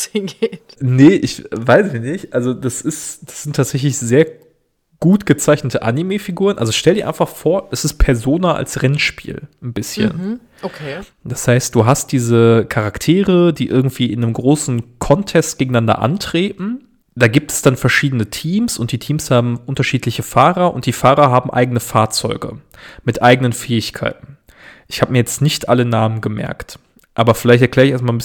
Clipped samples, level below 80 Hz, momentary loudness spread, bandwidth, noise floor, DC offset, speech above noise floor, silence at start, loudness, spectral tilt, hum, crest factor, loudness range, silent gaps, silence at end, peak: 0.2%; -34 dBFS; 13 LU; 18.5 kHz; -60 dBFS; under 0.1%; 45 dB; 0 s; -15 LUFS; -5.5 dB/octave; none; 16 dB; 4 LU; none; 0 s; 0 dBFS